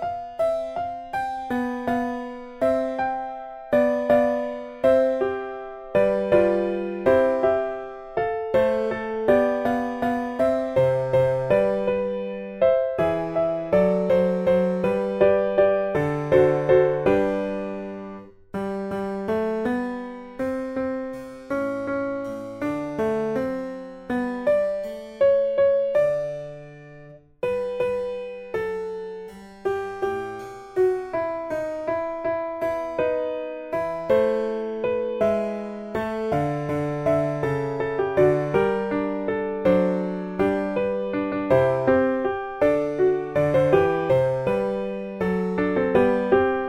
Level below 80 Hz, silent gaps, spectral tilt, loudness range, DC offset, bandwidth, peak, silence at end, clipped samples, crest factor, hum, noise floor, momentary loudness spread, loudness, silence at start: -52 dBFS; none; -8 dB/octave; 7 LU; under 0.1%; 11.5 kHz; -6 dBFS; 0 s; under 0.1%; 18 dB; none; -46 dBFS; 11 LU; -23 LUFS; 0 s